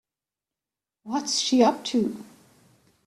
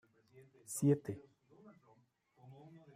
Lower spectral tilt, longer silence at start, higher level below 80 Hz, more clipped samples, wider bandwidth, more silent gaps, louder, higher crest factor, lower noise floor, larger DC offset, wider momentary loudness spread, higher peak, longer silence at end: second, -3.5 dB/octave vs -7 dB/octave; first, 1.05 s vs 0.35 s; first, -72 dBFS vs -80 dBFS; neither; second, 13 kHz vs 15.5 kHz; neither; first, -24 LUFS vs -37 LUFS; about the same, 20 dB vs 22 dB; first, -90 dBFS vs -72 dBFS; neither; second, 11 LU vs 25 LU; first, -8 dBFS vs -20 dBFS; first, 0.8 s vs 0.2 s